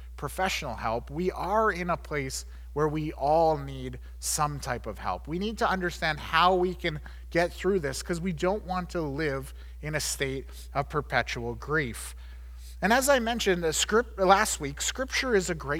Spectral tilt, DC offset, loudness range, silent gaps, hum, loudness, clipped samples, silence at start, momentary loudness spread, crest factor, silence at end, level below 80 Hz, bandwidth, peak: -4 dB/octave; under 0.1%; 5 LU; none; none; -28 LUFS; under 0.1%; 0 s; 13 LU; 22 dB; 0 s; -42 dBFS; 19 kHz; -6 dBFS